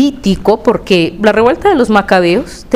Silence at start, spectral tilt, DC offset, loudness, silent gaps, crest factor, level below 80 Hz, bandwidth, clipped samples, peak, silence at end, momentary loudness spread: 0 s; -6 dB/octave; 0.6%; -11 LUFS; none; 10 dB; -34 dBFS; 15.5 kHz; 0.5%; 0 dBFS; 0 s; 4 LU